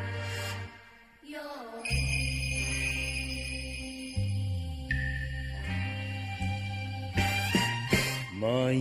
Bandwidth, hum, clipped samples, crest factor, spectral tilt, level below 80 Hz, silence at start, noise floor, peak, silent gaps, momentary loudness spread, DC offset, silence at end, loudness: 15.5 kHz; none; under 0.1%; 20 dB; -4.5 dB/octave; -42 dBFS; 0 s; -54 dBFS; -12 dBFS; none; 10 LU; under 0.1%; 0 s; -32 LUFS